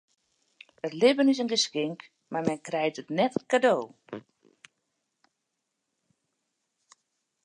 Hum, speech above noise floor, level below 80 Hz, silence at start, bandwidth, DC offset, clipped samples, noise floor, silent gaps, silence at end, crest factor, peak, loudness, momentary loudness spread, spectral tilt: none; 56 dB; -78 dBFS; 0.85 s; 10.5 kHz; under 0.1%; under 0.1%; -82 dBFS; none; 3.25 s; 20 dB; -10 dBFS; -27 LUFS; 19 LU; -4 dB/octave